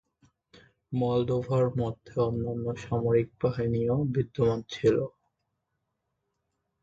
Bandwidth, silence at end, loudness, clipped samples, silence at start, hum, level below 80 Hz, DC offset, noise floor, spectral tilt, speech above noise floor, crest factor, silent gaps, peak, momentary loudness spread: 7.6 kHz; 1.75 s; -28 LUFS; under 0.1%; 0.9 s; none; -54 dBFS; under 0.1%; -81 dBFS; -8.5 dB/octave; 54 dB; 18 dB; none; -12 dBFS; 6 LU